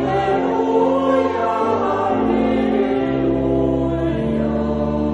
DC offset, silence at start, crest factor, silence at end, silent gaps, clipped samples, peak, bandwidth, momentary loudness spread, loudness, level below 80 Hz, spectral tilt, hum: under 0.1%; 0 s; 12 dB; 0 s; none; under 0.1%; -4 dBFS; 8 kHz; 3 LU; -18 LUFS; -36 dBFS; -8 dB/octave; none